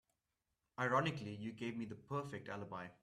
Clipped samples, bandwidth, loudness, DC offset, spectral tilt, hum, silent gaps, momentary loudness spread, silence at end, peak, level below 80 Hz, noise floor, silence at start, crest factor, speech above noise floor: under 0.1%; 13 kHz; -42 LUFS; under 0.1%; -6 dB/octave; none; none; 12 LU; 0.1 s; -22 dBFS; -76 dBFS; -89 dBFS; 0.8 s; 22 dB; 47 dB